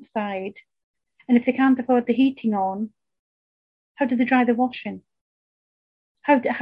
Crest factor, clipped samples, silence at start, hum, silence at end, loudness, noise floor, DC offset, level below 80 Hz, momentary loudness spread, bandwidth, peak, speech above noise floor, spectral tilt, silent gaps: 20 dB; under 0.1%; 0.15 s; none; 0 s; -22 LUFS; under -90 dBFS; under 0.1%; -68 dBFS; 15 LU; 5 kHz; -4 dBFS; over 69 dB; -8.5 dB/octave; 0.84-0.94 s, 3.19-3.95 s, 5.21-6.15 s